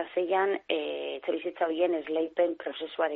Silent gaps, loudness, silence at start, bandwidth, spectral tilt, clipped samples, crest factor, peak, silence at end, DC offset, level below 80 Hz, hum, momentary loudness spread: none; -30 LUFS; 0 s; 4.2 kHz; -1 dB/octave; under 0.1%; 16 dB; -14 dBFS; 0 s; under 0.1%; -76 dBFS; none; 7 LU